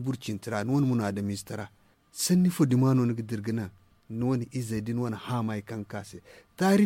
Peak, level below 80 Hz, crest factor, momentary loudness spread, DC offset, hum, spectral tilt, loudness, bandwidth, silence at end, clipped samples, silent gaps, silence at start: -12 dBFS; -62 dBFS; 16 dB; 16 LU; under 0.1%; none; -6 dB/octave; -28 LUFS; 16.5 kHz; 0 s; under 0.1%; none; 0 s